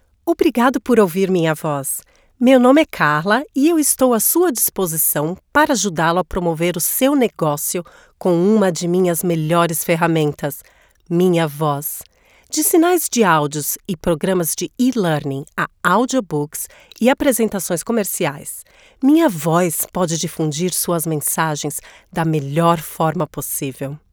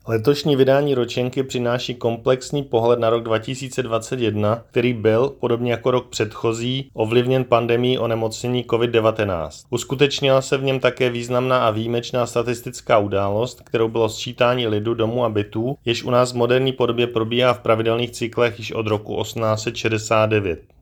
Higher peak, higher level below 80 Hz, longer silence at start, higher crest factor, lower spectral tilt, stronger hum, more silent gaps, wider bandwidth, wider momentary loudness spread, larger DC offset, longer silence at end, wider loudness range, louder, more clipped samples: about the same, 0 dBFS vs 0 dBFS; about the same, -48 dBFS vs -52 dBFS; first, 0.25 s vs 0.05 s; about the same, 16 dB vs 20 dB; about the same, -4.5 dB/octave vs -5.5 dB/octave; neither; neither; first, over 20 kHz vs 18 kHz; first, 9 LU vs 6 LU; neither; about the same, 0.15 s vs 0.2 s; first, 4 LU vs 1 LU; first, -17 LUFS vs -20 LUFS; neither